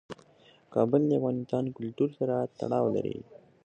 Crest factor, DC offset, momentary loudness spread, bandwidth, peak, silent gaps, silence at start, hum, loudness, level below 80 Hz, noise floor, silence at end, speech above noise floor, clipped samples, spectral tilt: 18 dB; under 0.1%; 12 LU; 8.6 kHz; -12 dBFS; none; 0.1 s; none; -29 LUFS; -68 dBFS; -60 dBFS; 0.3 s; 31 dB; under 0.1%; -9.5 dB/octave